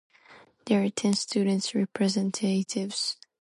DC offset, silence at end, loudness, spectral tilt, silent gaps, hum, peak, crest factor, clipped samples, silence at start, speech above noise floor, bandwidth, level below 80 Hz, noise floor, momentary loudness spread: under 0.1%; 0.25 s; -27 LUFS; -4.5 dB/octave; none; none; -10 dBFS; 18 dB; under 0.1%; 0.3 s; 28 dB; 11.5 kHz; -74 dBFS; -55 dBFS; 4 LU